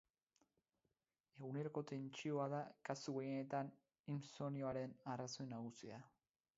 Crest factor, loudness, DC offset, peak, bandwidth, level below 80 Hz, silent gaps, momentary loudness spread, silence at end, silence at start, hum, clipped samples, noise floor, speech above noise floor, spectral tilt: 20 dB; -48 LUFS; under 0.1%; -28 dBFS; 7.6 kHz; -86 dBFS; 4.00-4.04 s; 9 LU; 0.5 s; 1.35 s; none; under 0.1%; under -90 dBFS; over 43 dB; -6 dB/octave